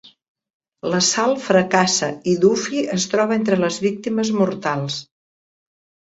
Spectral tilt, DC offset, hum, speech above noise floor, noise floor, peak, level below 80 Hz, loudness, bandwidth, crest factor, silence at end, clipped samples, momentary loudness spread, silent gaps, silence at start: -4 dB/octave; under 0.1%; none; over 71 dB; under -90 dBFS; -2 dBFS; -60 dBFS; -19 LUFS; 8 kHz; 18 dB; 1.05 s; under 0.1%; 7 LU; none; 0.85 s